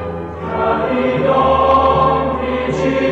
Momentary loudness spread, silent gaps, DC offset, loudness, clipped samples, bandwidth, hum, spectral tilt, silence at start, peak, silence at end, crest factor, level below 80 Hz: 9 LU; none; under 0.1%; -15 LUFS; under 0.1%; 8 kHz; none; -7 dB/octave; 0 s; -4 dBFS; 0 s; 12 dB; -34 dBFS